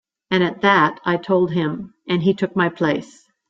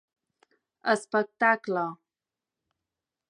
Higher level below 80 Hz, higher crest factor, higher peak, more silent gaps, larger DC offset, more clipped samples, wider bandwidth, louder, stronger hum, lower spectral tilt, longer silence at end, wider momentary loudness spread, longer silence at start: first, -60 dBFS vs -86 dBFS; about the same, 18 dB vs 22 dB; first, -2 dBFS vs -8 dBFS; neither; neither; neither; second, 7.8 kHz vs 11 kHz; first, -19 LUFS vs -27 LUFS; neither; first, -7 dB/octave vs -4.5 dB/octave; second, 0.45 s vs 1.35 s; about the same, 9 LU vs 9 LU; second, 0.3 s vs 0.85 s